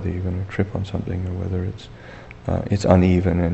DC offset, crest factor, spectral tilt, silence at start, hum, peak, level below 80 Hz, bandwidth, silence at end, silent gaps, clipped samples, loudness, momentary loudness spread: under 0.1%; 20 dB; -8 dB/octave; 0 s; none; 0 dBFS; -38 dBFS; 8.2 kHz; 0 s; none; under 0.1%; -22 LUFS; 21 LU